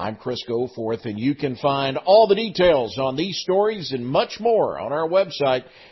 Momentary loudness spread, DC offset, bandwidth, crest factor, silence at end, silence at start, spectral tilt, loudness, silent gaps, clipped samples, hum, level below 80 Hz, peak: 10 LU; under 0.1%; 6.2 kHz; 18 dB; 0.3 s; 0 s; -6 dB/octave; -21 LUFS; none; under 0.1%; none; -54 dBFS; -4 dBFS